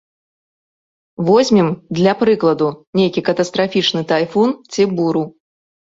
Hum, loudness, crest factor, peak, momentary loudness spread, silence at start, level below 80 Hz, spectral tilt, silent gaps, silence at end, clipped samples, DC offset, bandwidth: none; -16 LUFS; 16 dB; -2 dBFS; 5 LU; 1.2 s; -56 dBFS; -6 dB/octave; 2.87-2.93 s; 0.65 s; under 0.1%; under 0.1%; 8 kHz